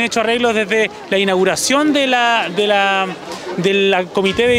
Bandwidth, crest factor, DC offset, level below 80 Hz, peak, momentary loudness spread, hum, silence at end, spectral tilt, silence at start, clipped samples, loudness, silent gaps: 16 kHz; 12 dB; under 0.1%; -52 dBFS; -2 dBFS; 5 LU; none; 0 s; -3.5 dB/octave; 0 s; under 0.1%; -15 LUFS; none